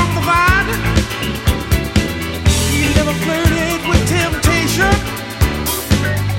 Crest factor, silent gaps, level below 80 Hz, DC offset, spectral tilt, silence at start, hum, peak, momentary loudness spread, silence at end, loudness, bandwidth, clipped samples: 14 dB; none; -22 dBFS; under 0.1%; -4.5 dB/octave; 0 s; none; 0 dBFS; 5 LU; 0 s; -15 LUFS; 17 kHz; under 0.1%